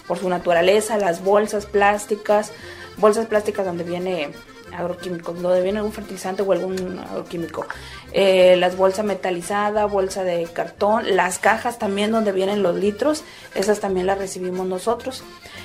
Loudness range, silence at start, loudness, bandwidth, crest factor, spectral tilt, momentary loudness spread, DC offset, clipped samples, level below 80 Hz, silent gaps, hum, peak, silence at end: 5 LU; 0.05 s; -21 LUFS; 15.5 kHz; 20 dB; -4.5 dB/octave; 12 LU; under 0.1%; under 0.1%; -52 dBFS; none; none; 0 dBFS; 0 s